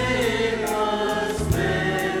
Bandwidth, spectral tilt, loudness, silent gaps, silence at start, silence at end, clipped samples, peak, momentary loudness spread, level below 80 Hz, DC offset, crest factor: 18 kHz; -5 dB/octave; -23 LUFS; none; 0 s; 0 s; under 0.1%; -10 dBFS; 2 LU; -38 dBFS; under 0.1%; 14 dB